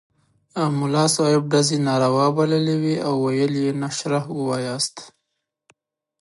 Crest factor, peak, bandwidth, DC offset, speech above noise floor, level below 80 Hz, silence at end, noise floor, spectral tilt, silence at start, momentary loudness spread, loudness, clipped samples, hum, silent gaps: 16 dB; -6 dBFS; 11.5 kHz; under 0.1%; 58 dB; -68 dBFS; 1.1 s; -78 dBFS; -5 dB/octave; 0.55 s; 7 LU; -21 LUFS; under 0.1%; none; none